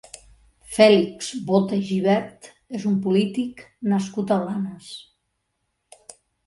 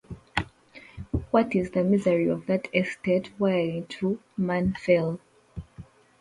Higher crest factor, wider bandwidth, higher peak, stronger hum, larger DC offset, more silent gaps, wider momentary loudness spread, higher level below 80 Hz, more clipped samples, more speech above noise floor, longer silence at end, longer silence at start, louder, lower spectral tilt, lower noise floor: about the same, 20 dB vs 20 dB; about the same, 11.5 kHz vs 11 kHz; first, -4 dBFS vs -8 dBFS; neither; neither; neither; about the same, 18 LU vs 18 LU; second, -60 dBFS vs -48 dBFS; neither; first, 54 dB vs 26 dB; first, 1.45 s vs 0.35 s; first, 0.7 s vs 0.1 s; first, -22 LUFS vs -26 LUFS; second, -6 dB/octave vs -7.5 dB/octave; first, -75 dBFS vs -51 dBFS